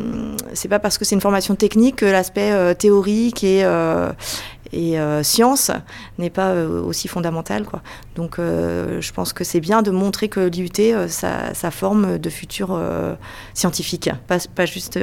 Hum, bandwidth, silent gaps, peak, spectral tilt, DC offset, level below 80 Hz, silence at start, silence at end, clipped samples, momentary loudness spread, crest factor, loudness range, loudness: none; 17.5 kHz; none; -2 dBFS; -4.5 dB/octave; under 0.1%; -44 dBFS; 0 s; 0 s; under 0.1%; 12 LU; 18 dB; 6 LU; -19 LUFS